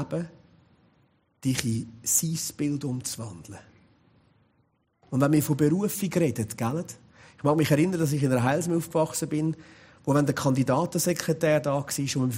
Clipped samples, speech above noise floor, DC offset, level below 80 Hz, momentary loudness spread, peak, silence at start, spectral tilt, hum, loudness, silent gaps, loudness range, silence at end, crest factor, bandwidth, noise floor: under 0.1%; 44 dB; under 0.1%; -62 dBFS; 11 LU; -4 dBFS; 0 s; -5.5 dB/octave; none; -26 LUFS; none; 5 LU; 0 s; 22 dB; 16 kHz; -69 dBFS